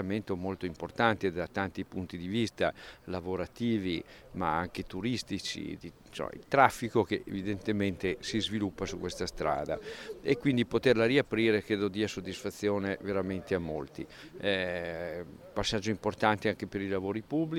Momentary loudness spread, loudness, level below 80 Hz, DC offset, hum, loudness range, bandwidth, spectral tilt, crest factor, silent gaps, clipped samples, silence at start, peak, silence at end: 12 LU; -32 LUFS; -56 dBFS; under 0.1%; none; 5 LU; 16.5 kHz; -5.5 dB/octave; 26 dB; none; under 0.1%; 0 s; -6 dBFS; 0 s